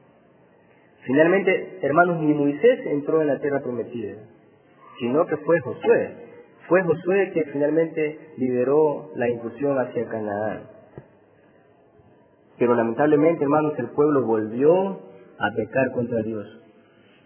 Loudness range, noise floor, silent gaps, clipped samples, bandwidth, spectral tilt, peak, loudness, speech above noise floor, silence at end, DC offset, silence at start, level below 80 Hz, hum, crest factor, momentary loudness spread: 5 LU; -55 dBFS; none; under 0.1%; 3.4 kHz; -11 dB/octave; -2 dBFS; -22 LUFS; 34 dB; 0.65 s; under 0.1%; 1.05 s; -66 dBFS; none; 20 dB; 11 LU